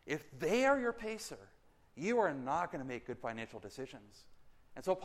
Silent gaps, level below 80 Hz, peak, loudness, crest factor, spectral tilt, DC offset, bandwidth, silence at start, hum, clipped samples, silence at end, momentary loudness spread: none; -66 dBFS; -18 dBFS; -37 LUFS; 20 dB; -5 dB/octave; under 0.1%; 15 kHz; 0.05 s; none; under 0.1%; 0 s; 17 LU